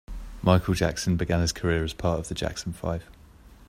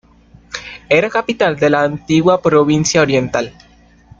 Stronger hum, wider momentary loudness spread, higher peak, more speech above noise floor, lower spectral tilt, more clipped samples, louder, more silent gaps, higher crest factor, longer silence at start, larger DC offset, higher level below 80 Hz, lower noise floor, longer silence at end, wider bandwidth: neither; second, 10 LU vs 16 LU; about the same, -4 dBFS vs -2 dBFS; second, 25 dB vs 32 dB; about the same, -5.5 dB/octave vs -5 dB/octave; neither; second, -27 LUFS vs -14 LUFS; neither; first, 22 dB vs 14 dB; second, 0.1 s vs 0.55 s; neither; first, -40 dBFS vs -48 dBFS; first, -50 dBFS vs -46 dBFS; second, 0.05 s vs 0.7 s; first, 15.5 kHz vs 7.8 kHz